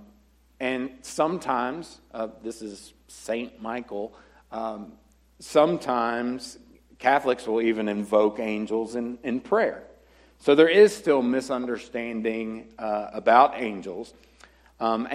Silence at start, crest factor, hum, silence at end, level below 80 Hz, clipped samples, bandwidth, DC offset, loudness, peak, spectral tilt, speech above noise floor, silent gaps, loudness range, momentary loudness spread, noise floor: 0.6 s; 22 dB; none; 0 s; -62 dBFS; under 0.1%; 14 kHz; under 0.1%; -25 LUFS; -2 dBFS; -5 dB/octave; 34 dB; none; 10 LU; 20 LU; -59 dBFS